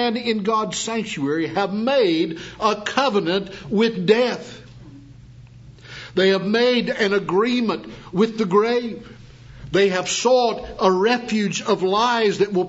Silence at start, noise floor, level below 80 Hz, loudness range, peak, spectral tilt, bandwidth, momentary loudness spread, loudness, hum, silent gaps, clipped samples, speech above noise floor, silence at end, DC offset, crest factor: 0 s; -43 dBFS; -52 dBFS; 3 LU; -2 dBFS; -4.5 dB/octave; 8 kHz; 8 LU; -20 LUFS; none; none; under 0.1%; 23 dB; 0 s; under 0.1%; 20 dB